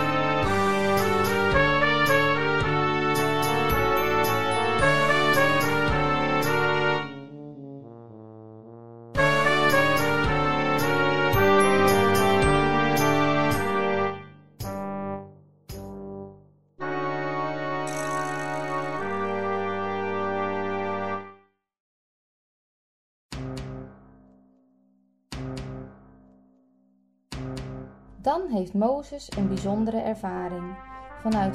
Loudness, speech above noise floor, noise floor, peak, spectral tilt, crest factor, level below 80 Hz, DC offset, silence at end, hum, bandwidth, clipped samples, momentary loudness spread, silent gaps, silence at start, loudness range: -24 LUFS; 38 dB; -65 dBFS; -6 dBFS; -5 dB/octave; 18 dB; -44 dBFS; under 0.1%; 0 s; none; 15.5 kHz; under 0.1%; 20 LU; 21.80-23.29 s; 0 s; 19 LU